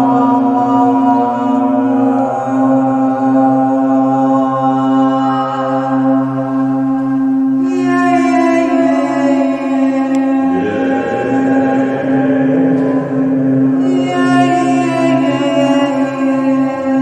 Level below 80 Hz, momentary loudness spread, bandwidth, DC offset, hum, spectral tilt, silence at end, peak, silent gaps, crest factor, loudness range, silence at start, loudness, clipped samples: -56 dBFS; 4 LU; 8.8 kHz; under 0.1%; none; -7 dB/octave; 0 s; 0 dBFS; none; 12 dB; 1 LU; 0 s; -13 LUFS; under 0.1%